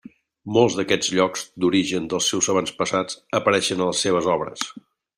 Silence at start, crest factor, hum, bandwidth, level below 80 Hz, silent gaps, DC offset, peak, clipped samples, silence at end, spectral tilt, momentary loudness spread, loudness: 0.45 s; 20 dB; none; 15.5 kHz; -60 dBFS; none; under 0.1%; -4 dBFS; under 0.1%; 0.4 s; -3.5 dB/octave; 6 LU; -21 LUFS